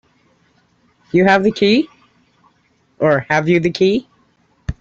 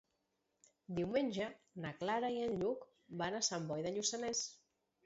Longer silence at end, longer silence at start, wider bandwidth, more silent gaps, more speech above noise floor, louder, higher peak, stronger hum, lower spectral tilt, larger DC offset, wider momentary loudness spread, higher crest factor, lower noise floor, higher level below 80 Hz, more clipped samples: second, 0.1 s vs 0.5 s; first, 1.15 s vs 0.9 s; about the same, 7.8 kHz vs 7.6 kHz; neither; about the same, 45 dB vs 45 dB; first, -15 LUFS vs -40 LUFS; first, -2 dBFS vs -22 dBFS; neither; first, -6.5 dB/octave vs -4 dB/octave; neither; about the same, 12 LU vs 10 LU; about the same, 16 dB vs 18 dB; second, -59 dBFS vs -84 dBFS; first, -42 dBFS vs -74 dBFS; neither